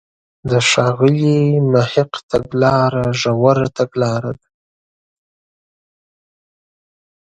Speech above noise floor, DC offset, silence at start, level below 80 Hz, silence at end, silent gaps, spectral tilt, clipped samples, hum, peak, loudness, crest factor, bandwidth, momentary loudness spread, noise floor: over 75 dB; under 0.1%; 0.45 s; -48 dBFS; 2.9 s; 2.23-2.29 s; -5.5 dB/octave; under 0.1%; none; 0 dBFS; -15 LUFS; 18 dB; 9.4 kHz; 7 LU; under -90 dBFS